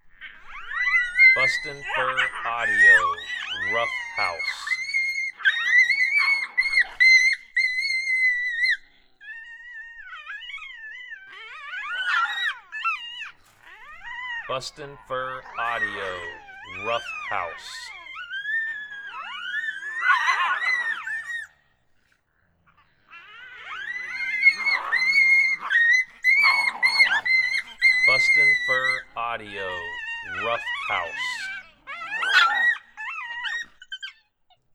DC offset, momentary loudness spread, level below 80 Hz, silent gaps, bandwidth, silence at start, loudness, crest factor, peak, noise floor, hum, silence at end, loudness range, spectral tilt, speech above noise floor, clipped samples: under 0.1%; 21 LU; -60 dBFS; none; 14 kHz; 0.05 s; -21 LUFS; 20 dB; -4 dBFS; -67 dBFS; none; 0.65 s; 12 LU; -0.5 dB/octave; 41 dB; under 0.1%